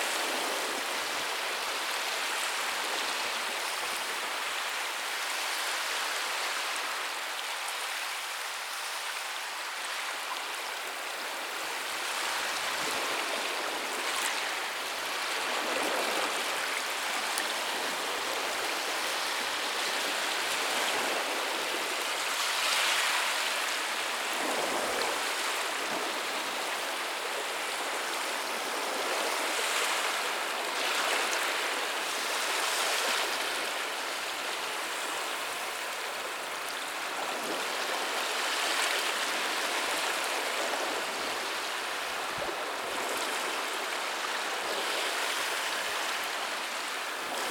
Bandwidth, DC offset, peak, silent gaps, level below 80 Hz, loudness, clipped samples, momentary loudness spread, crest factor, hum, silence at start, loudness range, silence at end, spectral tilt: 19 kHz; under 0.1%; -8 dBFS; none; -76 dBFS; -30 LUFS; under 0.1%; 6 LU; 24 dB; none; 0 s; 5 LU; 0 s; 1 dB/octave